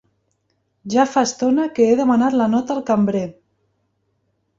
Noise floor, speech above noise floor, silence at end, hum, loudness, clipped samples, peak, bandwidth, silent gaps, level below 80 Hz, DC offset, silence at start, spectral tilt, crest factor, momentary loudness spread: -69 dBFS; 52 dB; 1.3 s; none; -18 LUFS; under 0.1%; -2 dBFS; 7.8 kHz; none; -60 dBFS; under 0.1%; 0.85 s; -5.5 dB/octave; 16 dB; 7 LU